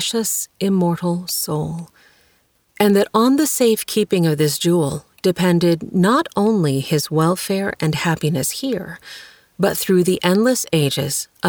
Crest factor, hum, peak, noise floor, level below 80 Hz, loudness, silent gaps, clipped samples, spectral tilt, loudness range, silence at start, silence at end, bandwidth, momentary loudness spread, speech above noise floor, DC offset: 18 dB; none; 0 dBFS; -60 dBFS; -54 dBFS; -18 LUFS; none; under 0.1%; -5 dB/octave; 3 LU; 0 s; 0 s; over 20 kHz; 8 LU; 42 dB; under 0.1%